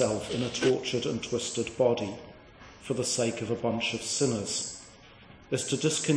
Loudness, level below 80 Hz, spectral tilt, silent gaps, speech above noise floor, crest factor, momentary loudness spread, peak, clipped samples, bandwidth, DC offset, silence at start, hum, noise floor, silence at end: -29 LUFS; -60 dBFS; -4 dB/octave; none; 23 dB; 18 dB; 11 LU; -12 dBFS; under 0.1%; 10.5 kHz; under 0.1%; 0 s; none; -52 dBFS; 0 s